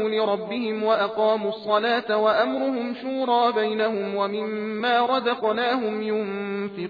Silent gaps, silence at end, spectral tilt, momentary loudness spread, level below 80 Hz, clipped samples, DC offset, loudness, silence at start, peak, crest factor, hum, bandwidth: none; 0 s; -7 dB/octave; 7 LU; -74 dBFS; under 0.1%; under 0.1%; -24 LUFS; 0 s; -8 dBFS; 16 dB; none; 5 kHz